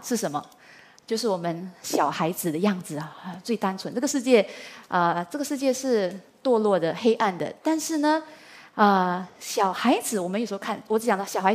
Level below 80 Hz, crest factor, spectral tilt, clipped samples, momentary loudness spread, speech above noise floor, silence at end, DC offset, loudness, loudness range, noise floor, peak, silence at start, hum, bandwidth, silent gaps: -76 dBFS; 20 dB; -4.5 dB/octave; under 0.1%; 10 LU; 27 dB; 0 s; under 0.1%; -25 LUFS; 4 LU; -52 dBFS; -4 dBFS; 0 s; none; 15.5 kHz; none